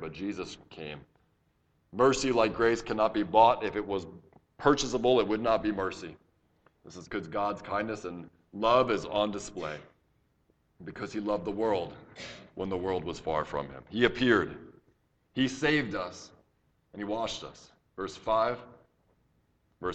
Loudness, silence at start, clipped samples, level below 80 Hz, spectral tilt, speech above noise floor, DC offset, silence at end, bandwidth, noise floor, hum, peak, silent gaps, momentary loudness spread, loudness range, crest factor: -29 LUFS; 0 s; under 0.1%; -56 dBFS; -4.5 dB/octave; 42 dB; under 0.1%; 0 s; 9 kHz; -71 dBFS; none; -8 dBFS; none; 19 LU; 8 LU; 24 dB